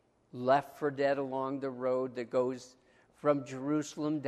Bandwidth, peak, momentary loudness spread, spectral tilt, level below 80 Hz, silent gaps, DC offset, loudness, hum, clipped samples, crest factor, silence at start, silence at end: 13 kHz; -14 dBFS; 7 LU; -6 dB/octave; -76 dBFS; none; under 0.1%; -33 LUFS; none; under 0.1%; 20 dB; 0.35 s; 0 s